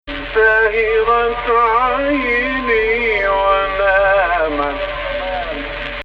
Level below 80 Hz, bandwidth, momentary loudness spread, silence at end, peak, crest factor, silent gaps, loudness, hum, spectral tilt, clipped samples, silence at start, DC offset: -34 dBFS; 5.8 kHz; 9 LU; 0 s; -2 dBFS; 14 dB; none; -15 LUFS; none; -6 dB/octave; under 0.1%; 0.05 s; under 0.1%